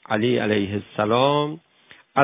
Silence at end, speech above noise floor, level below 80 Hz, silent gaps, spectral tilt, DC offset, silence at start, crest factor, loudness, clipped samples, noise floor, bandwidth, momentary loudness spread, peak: 0 s; 26 dB; -56 dBFS; none; -10 dB/octave; under 0.1%; 0.1 s; 20 dB; -22 LUFS; under 0.1%; -47 dBFS; 3.9 kHz; 9 LU; -2 dBFS